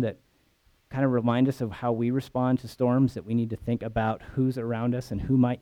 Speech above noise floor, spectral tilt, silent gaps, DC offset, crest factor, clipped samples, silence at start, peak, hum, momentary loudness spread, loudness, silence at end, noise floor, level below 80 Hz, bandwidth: 39 dB; -8.5 dB/octave; none; under 0.1%; 14 dB; under 0.1%; 0 s; -12 dBFS; none; 6 LU; -27 LUFS; 0.05 s; -65 dBFS; -50 dBFS; 13.5 kHz